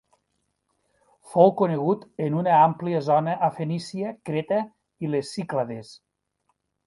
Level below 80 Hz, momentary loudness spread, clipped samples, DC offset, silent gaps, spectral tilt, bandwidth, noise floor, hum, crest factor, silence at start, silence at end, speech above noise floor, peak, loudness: -70 dBFS; 13 LU; under 0.1%; under 0.1%; none; -7.5 dB/octave; 11.5 kHz; -75 dBFS; none; 22 dB; 1.25 s; 0.9 s; 52 dB; -4 dBFS; -24 LUFS